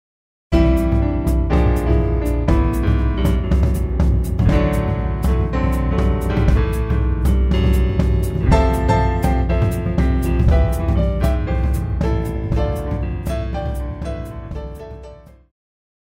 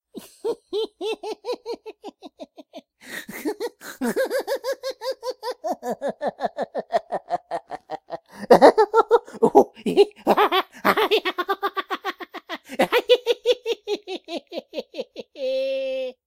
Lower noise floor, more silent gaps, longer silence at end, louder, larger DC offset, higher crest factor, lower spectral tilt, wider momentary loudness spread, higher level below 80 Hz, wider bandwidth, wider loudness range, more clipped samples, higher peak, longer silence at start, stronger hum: second, -39 dBFS vs -45 dBFS; neither; first, 0.9 s vs 0.15 s; first, -19 LUFS vs -23 LUFS; neither; second, 16 dB vs 24 dB; first, -8 dB/octave vs -4 dB/octave; second, 8 LU vs 17 LU; first, -20 dBFS vs -64 dBFS; about the same, 15.5 kHz vs 16 kHz; second, 6 LU vs 12 LU; neither; about the same, -2 dBFS vs 0 dBFS; first, 0.5 s vs 0.15 s; neither